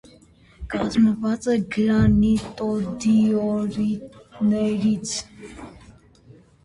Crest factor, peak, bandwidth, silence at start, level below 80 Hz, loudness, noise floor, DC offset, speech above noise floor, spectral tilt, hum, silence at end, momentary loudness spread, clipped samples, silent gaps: 16 dB; -6 dBFS; 11 kHz; 0.6 s; -42 dBFS; -22 LUFS; -52 dBFS; under 0.1%; 31 dB; -6.5 dB/octave; none; 0.75 s; 20 LU; under 0.1%; none